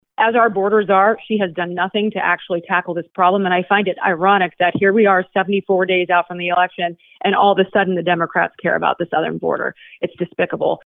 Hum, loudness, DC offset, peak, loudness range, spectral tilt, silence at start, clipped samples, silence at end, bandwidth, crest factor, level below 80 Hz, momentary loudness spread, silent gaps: none; -17 LUFS; under 0.1%; 0 dBFS; 2 LU; -9.5 dB/octave; 0.2 s; under 0.1%; 0.1 s; 4 kHz; 16 dB; -64 dBFS; 7 LU; none